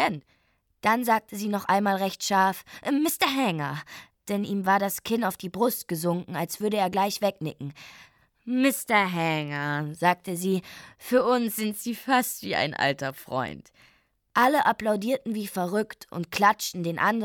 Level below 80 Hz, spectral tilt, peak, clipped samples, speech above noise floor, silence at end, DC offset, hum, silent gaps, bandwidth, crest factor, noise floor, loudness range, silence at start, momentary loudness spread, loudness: -66 dBFS; -4.5 dB/octave; -6 dBFS; under 0.1%; 43 dB; 0 s; under 0.1%; none; none; 19 kHz; 20 dB; -69 dBFS; 3 LU; 0 s; 12 LU; -26 LUFS